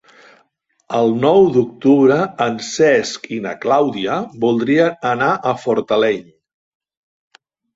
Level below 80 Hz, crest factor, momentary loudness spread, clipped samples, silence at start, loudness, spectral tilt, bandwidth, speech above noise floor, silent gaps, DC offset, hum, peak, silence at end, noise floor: -58 dBFS; 14 dB; 10 LU; under 0.1%; 0.9 s; -16 LUFS; -5.5 dB/octave; 8 kHz; 46 dB; none; under 0.1%; none; -2 dBFS; 1.55 s; -62 dBFS